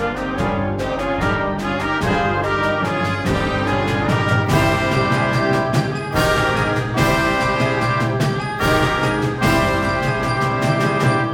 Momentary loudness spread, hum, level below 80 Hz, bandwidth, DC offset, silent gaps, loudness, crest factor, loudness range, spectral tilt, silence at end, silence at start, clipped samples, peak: 4 LU; none; -34 dBFS; 19 kHz; under 0.1%; none; -18 LUFS; 16 dB; 2 LU; -6 dB/octave; 0 s; 0 s; under 0.1%; -2 dBFS